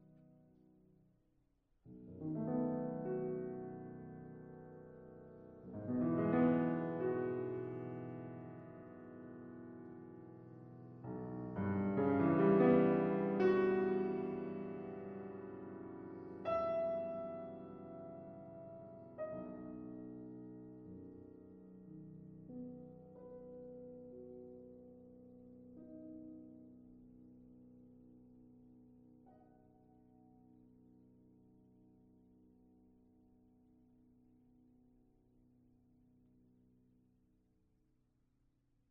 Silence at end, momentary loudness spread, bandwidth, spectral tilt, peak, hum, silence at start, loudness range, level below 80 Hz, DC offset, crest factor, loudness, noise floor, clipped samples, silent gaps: 9.5 s; 25 LU; 5.8 kHz; -8.5 dB/octave; -20 dBFS; none; 0.1 s; 22 LU; -74 dBFS; under 0.1%; 22 dB; -39 LUFS; -78 dBFS; under 0.1%; none